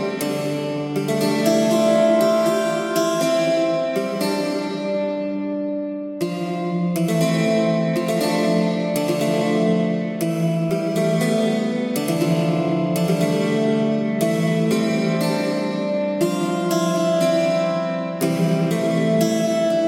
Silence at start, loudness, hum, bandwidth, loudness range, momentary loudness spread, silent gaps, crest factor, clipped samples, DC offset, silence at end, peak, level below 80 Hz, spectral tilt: 0 s; -20 LUFS; none; 16.5 kHz; 3 LU; 6 LU; none; 16 dB; under 0.1%; under 0.1%; 0 s; -4 dBFS; -66 dBFS; -6 dB/octave